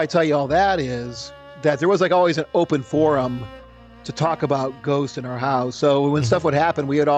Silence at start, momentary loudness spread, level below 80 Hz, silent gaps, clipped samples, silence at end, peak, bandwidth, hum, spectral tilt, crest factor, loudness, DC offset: 0 s; 13 LU; -50 dBFS; none; under 0.1%; 0 s; -6 dBFS; 8.8 kHz; none; -6 dB/octave; 14 dB; -20 LUFS; under 0.1%